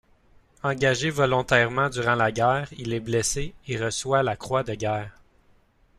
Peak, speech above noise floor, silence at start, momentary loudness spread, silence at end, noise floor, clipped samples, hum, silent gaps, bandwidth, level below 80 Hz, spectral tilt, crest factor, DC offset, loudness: -6 dBFS; 36 dB; 0.65 s; 10 LU; 0.85 s; -60 dBFS; under 0.1%; none; none; 14 kHz; -48 dBFS; -4.5 dB/octave; 20 dB; under 0.1%; -24 LUFS